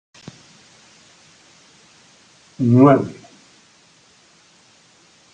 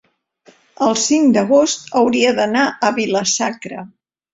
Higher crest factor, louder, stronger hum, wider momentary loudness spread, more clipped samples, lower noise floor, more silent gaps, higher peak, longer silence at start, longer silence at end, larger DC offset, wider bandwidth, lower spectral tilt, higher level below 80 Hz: about the same, 20 dB vs 16 dB; about the same, -15 LUFS vs -15 LUFS; neither; first, 30 LU vs 9 LU; neither; about the same, -53 dBFS vs -52 dBFS; neither; about the same, -2 dBFS vs -2 dBFS; first, 2.6 s vs 0.8 s; first, 2.2 s vs 0.45 s; neither; about the same, 9 kHz vs 8.2 kHz; first, -8.5 dB/octave vs -3 dB/octave; second, -66 dBFS vs -60 dBFS